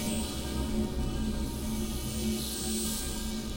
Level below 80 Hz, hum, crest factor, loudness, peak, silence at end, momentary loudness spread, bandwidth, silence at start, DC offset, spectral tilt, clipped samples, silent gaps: -38 dBFS; none; 14 dB; -33 LUFS; -20 dBFS; 0 s; 3 LU; 16.5 kHz; 0 s; under 0.1%; -4 dB/octave; under 0.1%; none